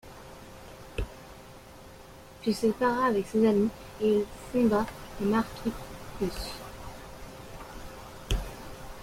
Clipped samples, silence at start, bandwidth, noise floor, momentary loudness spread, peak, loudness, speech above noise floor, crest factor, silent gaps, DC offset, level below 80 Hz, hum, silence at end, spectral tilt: under 0.1%; 0.05 s; 16.5 kHz; -49 dBFS; 22 LU; -12 dBFS; -29 LUFS; 22 dB; 18 dB; none; under 0.1%; -44 dBFS; none; 0 s; -6 dB/octave